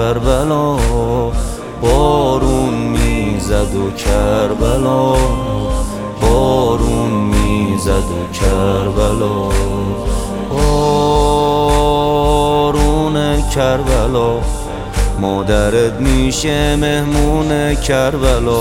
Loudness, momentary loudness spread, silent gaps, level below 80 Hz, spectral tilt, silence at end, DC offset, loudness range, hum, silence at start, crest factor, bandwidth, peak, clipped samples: -15 LUFS; 6 LU; none; -20 dBFS; -5.5 dB/octave; 0 s; under 0.1%; 2 LU; none; 0 s; 12 dB; 16 kHz; 0 dBFS; under 0.1%